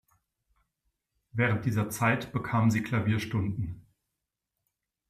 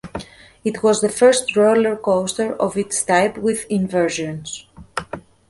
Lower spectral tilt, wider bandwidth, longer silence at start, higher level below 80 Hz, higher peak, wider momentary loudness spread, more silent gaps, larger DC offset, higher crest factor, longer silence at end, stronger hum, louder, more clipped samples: first, -6.5 dB/octave vs -4 dB/octave; first, 15 kHz vs 11.5 kHz; first, 1.35 s vs 0.05 s; second, -60 dBFS vs -52 dBFS; second, -12 dBFS vs -2 dBFS; second, 11 LU vs 16 LU; neither; neither; about the same, 20 dB vs 16 dB; first, 1.3 s vs 0.3 s; neither; second, -29 LUFS vs -18 LUFS; neither